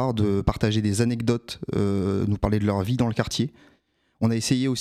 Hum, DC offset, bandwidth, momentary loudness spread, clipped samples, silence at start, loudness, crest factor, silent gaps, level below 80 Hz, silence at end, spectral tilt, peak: none; under 0.1%; 14.5 kHz; 4 LU; under 0.1%; 0 s; -24 LUFS; 18 dB; none; -42 dBFS; 0 s; -6 dB/octave; -6 dBFS